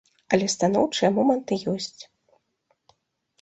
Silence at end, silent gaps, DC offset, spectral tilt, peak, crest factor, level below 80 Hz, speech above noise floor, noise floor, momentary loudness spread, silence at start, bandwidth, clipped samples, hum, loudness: 1.4 s; none; under 0.1%; -4.5 dB/octave; -4 dBFS; 22 dB; -64 dBFS; 49 dB; -72 dBFS; 9 LU; 0.3 s; 8.4 kHz; under 0.1%; none; -23 LUFS